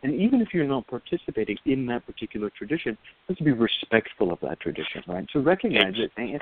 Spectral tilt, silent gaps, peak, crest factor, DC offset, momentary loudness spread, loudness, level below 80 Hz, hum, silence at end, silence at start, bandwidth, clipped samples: -4 dB/octave; none; -4 dBFS; 22 dB; under 0.1%; 11 LU; -26 LUFS; -56 dBFS; none; 0 s; 0.05 s; 4.6 kHz; under 0.1%